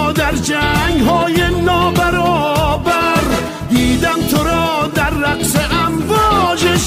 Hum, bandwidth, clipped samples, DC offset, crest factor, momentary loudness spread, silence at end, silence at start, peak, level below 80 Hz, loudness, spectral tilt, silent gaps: none; 16 kHz; under 0.1%; under 0.1%; 12 dB; 3 LU; 0 s; 0 s; -2 dBFS; -28 dBFS; -14 LUFS; -4.5 dB/octave; none